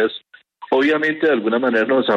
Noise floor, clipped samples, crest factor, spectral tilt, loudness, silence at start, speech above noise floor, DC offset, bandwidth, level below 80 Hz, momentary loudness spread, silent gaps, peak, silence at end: -42 dBFS; under 0.1%; 12 dB; -6 dB/octave; -18 LUFS; 0 s; 26 dB; under 0.1%; 7.6 kHz; -68 dBFS; 5 LU; none; -6 dBFS; 0 s